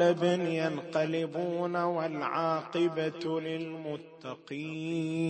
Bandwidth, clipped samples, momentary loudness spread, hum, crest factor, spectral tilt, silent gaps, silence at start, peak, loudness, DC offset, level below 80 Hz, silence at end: 8.8 kHz; under 0.1%; 11 LU; none; 18 dB; -6.5 dB/octave; none; 0 s; -14 dBFS; -32 LUFS; under 0.1%; -78 dBFS; 0 s